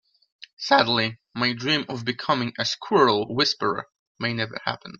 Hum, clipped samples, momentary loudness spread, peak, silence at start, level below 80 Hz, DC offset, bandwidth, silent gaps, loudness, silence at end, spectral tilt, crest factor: none; under 0.1%; 10 LU; -2 dBFS; 0.6 s; -64 dBFS; under 0.1%; 7.6 kHz; 3.99-4.15 s; -23 LUFS; 0.05 s; -4.5 dB/octave; 22 dB